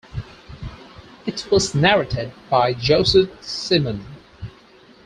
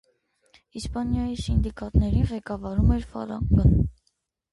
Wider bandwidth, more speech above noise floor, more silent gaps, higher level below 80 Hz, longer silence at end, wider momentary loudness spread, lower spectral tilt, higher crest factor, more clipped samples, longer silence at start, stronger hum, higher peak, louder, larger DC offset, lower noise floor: about the same, 10.5 kHz vs 11.5 kHz; second, 30 dB vs 50 dB; neither; second, -42 dBFS vs -30 dBFS; about the same, 0.55 s vs 0.6 s; first, 22 LU vs 12 LU; second, -4.5 dB/octave vs -8 dB/octave; about the same, 20 dB vs 18 dB; neither; second, 0.15 s vs 0.75 s; neither; first, -2 dBFS vs -8 dBFS; first, -19 LUFS vs -25 LUFS; neither; second, -49 dBFS vs -73 dBFS